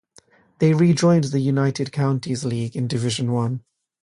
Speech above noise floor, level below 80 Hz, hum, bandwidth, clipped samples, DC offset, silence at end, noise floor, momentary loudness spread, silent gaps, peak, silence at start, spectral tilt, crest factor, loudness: 35 dB; -58 dBFS; none; 11 kHz; under 0.1%; under 0.1%; 0.45 s; -55 dBFS; 9 LU; none; -6 dBFS; 0.6 s; -6.5 dB/octave; 16 dB; -21 LUFS